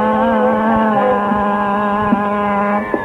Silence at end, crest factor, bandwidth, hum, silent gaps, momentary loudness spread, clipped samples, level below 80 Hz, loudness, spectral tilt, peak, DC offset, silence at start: 0 s; 14 dB; 4.4 kHz; none; none; 2 LU; under 0.1%; -42 dBFS; -15 LUFS; -8 dB/octave; 0 dBFS; under 0.1%; 0 s